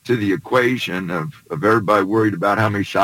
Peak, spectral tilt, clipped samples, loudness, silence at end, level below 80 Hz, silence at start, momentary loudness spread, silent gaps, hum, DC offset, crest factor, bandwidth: -2 dBFS; -6.5 dB/octave; under 0.1%; -18 LUFS; 0 s; -58 dBFS; 0.05 s; 8 LU; none; none; under 0.1%; 16 dB; 17 kHz